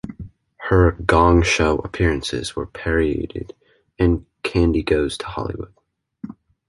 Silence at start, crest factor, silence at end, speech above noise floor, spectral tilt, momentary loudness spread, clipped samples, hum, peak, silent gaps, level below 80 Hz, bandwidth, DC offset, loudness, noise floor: 0.05 s; 18 dB; 0.35 s; 20 dB; -6 dB/octave; 22 LU; under 0.1%; none; -2 dBFS; none; -30 dBFS; 11.5 kHz; under 0.1%; -19 LUFS; -39 dBFS